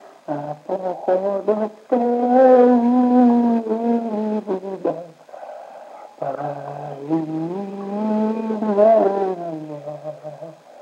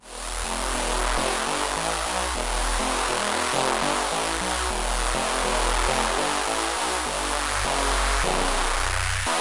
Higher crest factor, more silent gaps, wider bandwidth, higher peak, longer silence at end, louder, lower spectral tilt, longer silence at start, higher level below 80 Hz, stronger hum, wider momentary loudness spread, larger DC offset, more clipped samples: about the same, 18 dB vs 18 dB; neither; second, 7 kHz vs 11.5 kHz; first, -2 dBFS vs -6 dBFS; about the same, 0 s vs 0 s; first, -19 LUFS vs -24 LUFS; first, -9 dB/octave vs -2 dB/octave; about the same, 0.05 s vs 0.05 s; second, -88 dBFS vs -32 dBFS; neither; first, 22 LU vs 3 LU; neither; neither